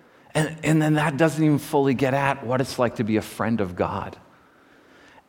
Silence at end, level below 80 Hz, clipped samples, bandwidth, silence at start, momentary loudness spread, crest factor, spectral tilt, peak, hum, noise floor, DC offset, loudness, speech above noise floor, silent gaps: 1.15 s; -56 dBFS; under 0.1%; 17 kHz; 0.35 s; 7 LU; 18 dB; -6.5 dB/octave; -6 dBFS; none; -54 dBFS; under 0.1%; -23 LUFS; 32 dB; none